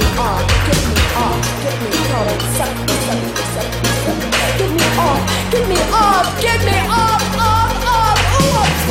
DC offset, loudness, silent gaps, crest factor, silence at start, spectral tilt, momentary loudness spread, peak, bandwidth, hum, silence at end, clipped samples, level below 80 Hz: under 0.1%; -15 LUFS; none; 14 dB; 0 s; -4 dB/octave; 5 LU; 0 dBFS; 16.5 kHz; none; 0 s; under 0.1%; -24 dBFS